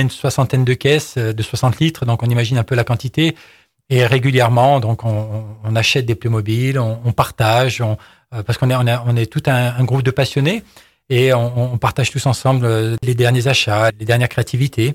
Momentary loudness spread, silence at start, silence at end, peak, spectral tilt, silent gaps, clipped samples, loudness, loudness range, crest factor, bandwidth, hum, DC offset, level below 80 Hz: 7 LU; 0 s; 0 s; -2 dBFS; -6 dB/octave; none; under 0.1%; -16 LUFS; 2 LU; 14 dB; 16 kHz; none; under 0.1%; -46 dBFS